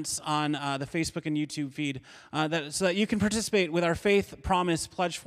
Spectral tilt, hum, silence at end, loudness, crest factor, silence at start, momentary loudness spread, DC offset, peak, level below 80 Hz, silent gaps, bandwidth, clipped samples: -4.5 dB/octave; none; 0.05 s; -28 LUFS; 18 dB; 0 s; 7 LU; under 0.1%; -12 dBFS; -52 dBFS; none; 15.5 kHz; under 0.1%